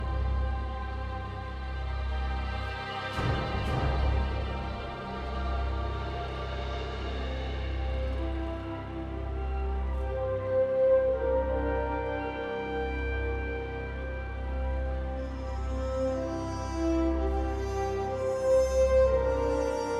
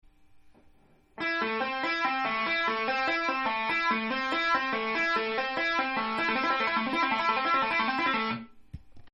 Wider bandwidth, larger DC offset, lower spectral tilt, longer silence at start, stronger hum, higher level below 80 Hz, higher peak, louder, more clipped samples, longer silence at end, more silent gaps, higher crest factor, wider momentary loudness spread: about the same, 10 kHz vs 11 kHz; neither; first, -7 dB/octave vs -4 dB/octave; second, 0 s vs 0.35 s; neither; first, -34 dBFS vs -62 dBFS; about the same, -14 dBFS vs -14 dBFS; second, -31 LUFS vs -28 LUFS; neither; about the same, 0 s vs 0.05 s; neither; about the same, 16 dB vs 16 dB; first, 11 LU vs 4 LU